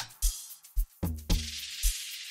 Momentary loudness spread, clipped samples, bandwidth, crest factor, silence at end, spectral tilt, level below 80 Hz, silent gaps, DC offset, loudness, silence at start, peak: 7 LU; under 0.1%; 16 kHz; 18 dB; 0 s; -3 dB/octave; -34 dBFS; none; under 0.1%; -34 LUFS; 0 s; -14 dBFS